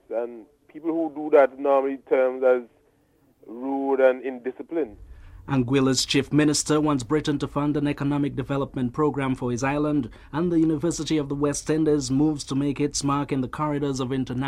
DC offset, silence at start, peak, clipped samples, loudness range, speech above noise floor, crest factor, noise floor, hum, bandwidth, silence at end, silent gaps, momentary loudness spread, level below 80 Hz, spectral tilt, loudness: under 0.1%; 0.1 s; -6 dBFS; under 0.1%; 3 LU; 39 dB; 18 dB; -62 dBFS; none; 13.5 kHz; 0 s; none; 9 LU; -50 dBFS; -5.5 dB/octave; -24 LUFS